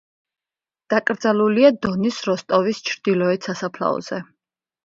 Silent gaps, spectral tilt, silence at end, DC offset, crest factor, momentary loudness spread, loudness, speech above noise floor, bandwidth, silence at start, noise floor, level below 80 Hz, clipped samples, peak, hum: none; -5.5 dB/octave; 0.65 s; under 0.1%; 20 dB; 10 LU; -20 LUFS; over 70 dB; 7.6 kHz; 0.9 s; under -90 dBFS; -60 dBFS; under 0.1%; -2 dBFS; none